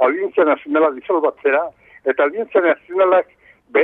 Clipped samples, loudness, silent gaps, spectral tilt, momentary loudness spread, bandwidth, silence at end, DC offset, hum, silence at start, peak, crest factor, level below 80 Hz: under 0.1%; -17 LUFS; none; -7.5 dB/octave; 6 LU; 3.9 kHz; 0 s; under 0.1%; none; 0 s; -2 dBFS; 14 dB; -66 dBFS